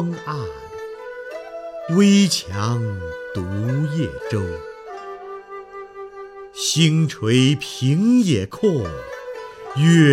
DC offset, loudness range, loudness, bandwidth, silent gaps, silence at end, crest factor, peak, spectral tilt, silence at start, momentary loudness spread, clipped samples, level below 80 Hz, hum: under 0.1%; 8 LU; -19 LUFS; 14.5 kHz; none; 0 s; 18 dB; -2 dBFS; -5.5 dB/octave; 0 s; 19 LU; under 0.1%; -50 dBFS; none